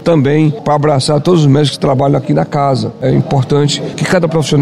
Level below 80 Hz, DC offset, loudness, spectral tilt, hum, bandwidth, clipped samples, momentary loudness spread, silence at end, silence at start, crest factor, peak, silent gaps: -42 dBFS; 0.6%; -12 LUFS; -6.5 dB/octave; none; 12 kHz; under 0.1%; 4 LU; 0 s; 0 s; 10 dB; 0 dBFS; none